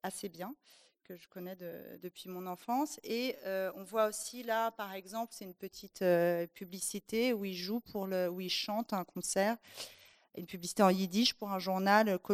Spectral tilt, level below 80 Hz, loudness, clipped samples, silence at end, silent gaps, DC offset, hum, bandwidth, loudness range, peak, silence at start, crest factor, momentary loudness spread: -4 dB/octave; -76 dBFS; -35 LUFS; under 0.1%; 0 s; none; under 0.1%; none; 15 kHz; 6 LU; -12 dBFS; 0.05 s; 24 dB; 18 LU